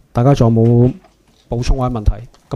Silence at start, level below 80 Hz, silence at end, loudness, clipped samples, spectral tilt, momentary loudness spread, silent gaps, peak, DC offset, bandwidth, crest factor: 0.15 s; -22 dBFS; 0 s; -15 LUFS; under 0.1%; -8.5 dB/octave; 14 LU; none; 0 dBFS; under 0.1%; 7.6 kHz; 14 dB